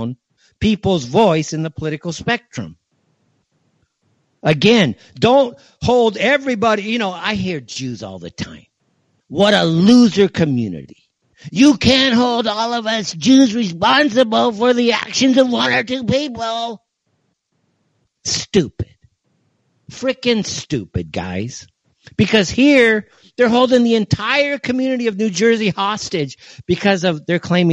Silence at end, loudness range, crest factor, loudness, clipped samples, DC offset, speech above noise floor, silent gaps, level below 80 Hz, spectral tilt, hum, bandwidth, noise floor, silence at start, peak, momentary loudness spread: 0 s; 8 LU; 16 dB; -16 LUFS; under 0.1%; under 0.1%; 51 dB; none; -46 dBFS; -5 dB/octave; none; 10 kHz; -67 dBFS; 0 s; 0 dBFS; 15 LU